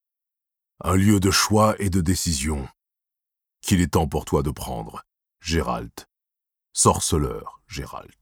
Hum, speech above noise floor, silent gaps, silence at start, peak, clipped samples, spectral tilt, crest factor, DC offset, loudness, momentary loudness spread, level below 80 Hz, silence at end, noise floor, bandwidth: none; 65 dB; none; 0.85 s; -2 dBFS; under 0.1%; -4.5 dB/octave; 20 dB; under 0.1%; -22 LUFS; 18 LU; -38 dBFS; 0.2 s; -87 dBFS; 18.5 kHz